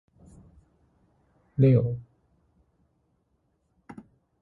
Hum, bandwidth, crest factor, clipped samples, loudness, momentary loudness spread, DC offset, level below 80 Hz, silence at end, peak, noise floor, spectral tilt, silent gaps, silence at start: none; 4.3 kHz; 20 dB; under 0.1%; -24 LUFS; 28 LU; under 0.1%; -58 dBFS; 2.4 s; -10 dBFS; -72 dBFS; -11.5 dB/octave; none; 1.6 s